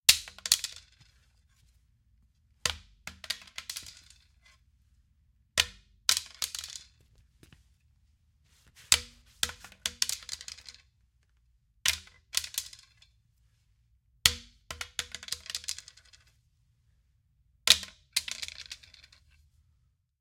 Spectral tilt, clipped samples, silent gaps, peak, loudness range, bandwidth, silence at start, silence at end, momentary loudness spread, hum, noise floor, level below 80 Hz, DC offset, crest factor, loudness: 1.5 dB/octave; under 0.1%; none; -2 dBFS; 9 LU; 16.5 kHz; 0.1 s; 1.45 s; 20 LU; none; -71 dBFS; -60 dBFS; under 0.1%; 34 dB; -30 LUFS